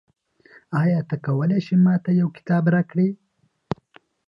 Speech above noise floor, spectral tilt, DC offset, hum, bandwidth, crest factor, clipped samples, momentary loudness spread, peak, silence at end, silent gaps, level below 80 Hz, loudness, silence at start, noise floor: 36 dB; -10 dB/octave; under 0.1%; none; 5.6 kHz; 16 dB; under 0.1%; 15 LU; -6 dBFS; 1.1 s; none; -62 dBFS; -21 LUFS; 0.7 s; -55 dBFS